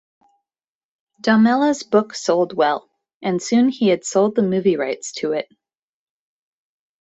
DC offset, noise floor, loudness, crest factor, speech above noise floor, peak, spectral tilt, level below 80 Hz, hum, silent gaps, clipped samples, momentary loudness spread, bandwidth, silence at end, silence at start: under 0.1%; under -90 dBFS; -19 LUFS; 18 dB; over 72 dB; -2 dBFS; -5 dB/octave; -66 dBFS; none; 3.14-3.21 s; under 0.1%; 9 LU; 8.2 kHz; 1.55 s; 1.25 s